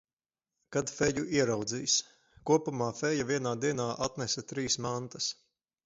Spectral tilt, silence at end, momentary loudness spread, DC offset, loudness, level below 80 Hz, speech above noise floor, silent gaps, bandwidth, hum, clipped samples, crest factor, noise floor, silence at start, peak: -3.5 dB/octave; 0.5 s; 7 LU; under 0.1%; -31 LUFS; -62 dBFS; over 59 dB; none; 8 kHz; none; under 0.1%; 20 dB; under -90 dBFS; 0.7 s; -12 dBFS